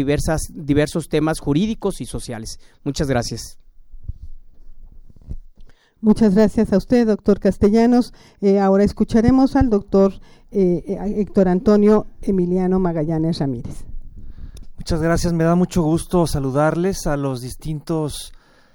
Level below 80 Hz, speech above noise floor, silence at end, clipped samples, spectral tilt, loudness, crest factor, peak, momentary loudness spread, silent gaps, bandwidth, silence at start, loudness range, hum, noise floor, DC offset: -34 dBFS; 25 dB; 0.45 s; under 0.1%; -7 dB/octave; -18 LUFS; 18 dB; -2 dBFS; 17 LU; none; 17.5 kHz; 0 s; 10 LU; none; -42 dBFS; under 0.1%